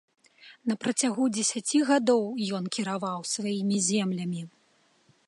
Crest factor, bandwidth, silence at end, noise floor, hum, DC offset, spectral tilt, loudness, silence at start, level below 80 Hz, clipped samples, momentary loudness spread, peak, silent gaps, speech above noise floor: 16 dB; 11.5 kHz; 0.8 s; -66 dBFS; none; under 0.1%; -4 dB/octave; -27 LUFS; 0.45 s; -78 dBFS; under 0.1%; 9 LU; -12 dBFS; none; 39 dB